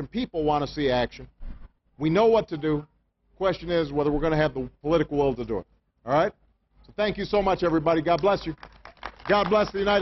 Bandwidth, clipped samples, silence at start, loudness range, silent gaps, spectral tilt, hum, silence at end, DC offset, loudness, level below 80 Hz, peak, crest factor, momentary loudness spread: 6.2 kHz; under 0.1%; 0 s; 2 LU; none; -7 dB/octave; none; 0 s; under 0.1%; -25 LUFS; -44 dBFS; -8 dBFS; 16 dB; 14 LU